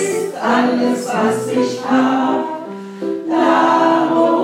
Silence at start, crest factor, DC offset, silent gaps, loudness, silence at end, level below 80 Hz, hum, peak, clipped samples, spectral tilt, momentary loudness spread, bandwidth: 0 s; 14 dB; under 0.1%; none; -16 LUFS; 0 s; -74 dBFS; none; -2 dBFS; under 0.1%; -5 dB/octave; 11 LU; 15.5 kHz